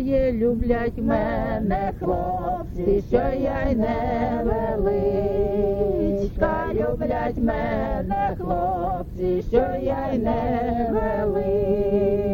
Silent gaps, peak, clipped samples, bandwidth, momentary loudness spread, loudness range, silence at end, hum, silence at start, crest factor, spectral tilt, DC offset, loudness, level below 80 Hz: none; -6 dBFS; under 0.1%; 17 kHz; 4 LU; 1 LU; 0 s; none; 0 s; 16 dB; -9.5 dB/octave; under 0.1%; -23 LUFS; -32 dBFS